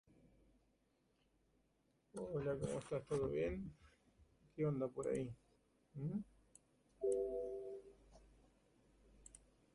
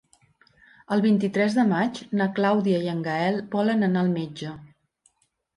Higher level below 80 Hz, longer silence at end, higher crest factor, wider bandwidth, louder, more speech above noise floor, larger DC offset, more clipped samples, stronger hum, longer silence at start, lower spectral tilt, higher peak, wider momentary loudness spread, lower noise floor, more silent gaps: about the same, -66 dBFS vs -68 dBFS; second, 0.35 s vs 0.9 s; about the same, 18 dB vs 14 dB; about the same, 11.5 kHz vs 11 kHz; second, -44 LUFS vs -24 LUFS; second, 38 dB vs 45 dB; neither; neither; neither; first, 2.15 s vs 0.9 s; about the same, -7.5 dB/octave vs -7 dB/octave; second, -28 dBFS vs -10 dBFS; first, 20 LU vs 9 LU; first, -80 dBFS vs -68 dBFS; neither